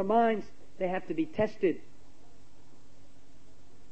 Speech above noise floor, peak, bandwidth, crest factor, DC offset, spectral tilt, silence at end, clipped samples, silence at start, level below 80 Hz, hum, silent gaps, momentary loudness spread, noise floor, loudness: 30 dB; -14 dBFS; 8.6 kHz; 18 dB; 1%; -7.5 dB/octave; 2.1 s; under 0.1%; 0 s; -64 dBFS; none; none; 12 LU; -59 dBFS; -31 LUFS